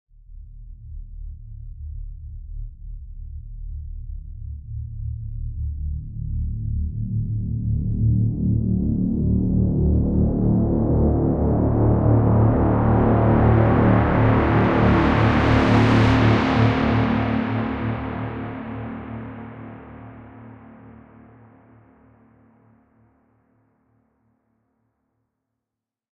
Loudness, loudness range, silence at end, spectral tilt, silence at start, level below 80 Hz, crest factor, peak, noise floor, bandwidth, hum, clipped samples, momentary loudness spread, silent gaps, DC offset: -20 LUFS; 20 LU; 5.25 s; -9 dB/octave; 0.3 s; -30 dBFS; 16 dB; -4 dBFS; -86 dBFS; 6.6 kHz; none; under 0.1%; 22 LU; none; under 0.1%